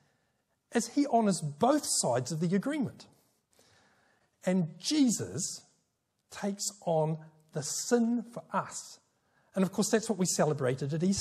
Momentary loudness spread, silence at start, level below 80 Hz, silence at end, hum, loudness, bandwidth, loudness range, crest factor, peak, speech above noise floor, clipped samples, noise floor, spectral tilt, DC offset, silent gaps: 11 LU; 0.7 s; -74 dBFS; 0 s; none; -31 LUFS; 14.5 kHz; 3 LU; 18 dB; -12 dBFS; 48 dB; under 0.1%; -79 dBFS; -4.5 dB/octave; under 0.1%; none